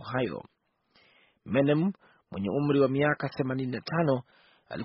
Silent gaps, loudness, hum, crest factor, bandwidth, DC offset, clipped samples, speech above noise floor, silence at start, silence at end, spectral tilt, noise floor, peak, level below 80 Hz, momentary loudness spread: none; -28 LUFS; none; 18 dB; 5.8 kHz; under 0.1%; under 0.1%; 39 dB; 0 s; 0 s; -6 dB/octave; -67 dBFS; -12 dBFS; -64 dBFS; 15 LU